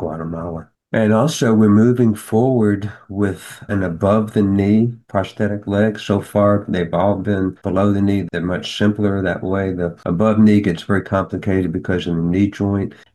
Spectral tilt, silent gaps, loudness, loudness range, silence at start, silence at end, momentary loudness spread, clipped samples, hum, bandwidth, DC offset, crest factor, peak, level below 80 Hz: -7.5 dB/octave; none; -17 LUFS; 2 LU; 0 s; 0.2 s; 9 LU; under 0.1%; none; 12.5 kHz; under 0.1%; 14 dB; -4 dBFS; -48 dBFS